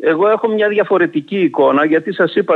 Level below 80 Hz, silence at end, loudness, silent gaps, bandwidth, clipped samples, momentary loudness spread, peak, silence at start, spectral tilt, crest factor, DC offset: -70 dBFS; 0 s; -14 LUFS; none; 4.5 kHz; under 0.1%; 4 LU; -2 dBFS; 0 s; -8 dB/octave; 12 dB; under 0.1%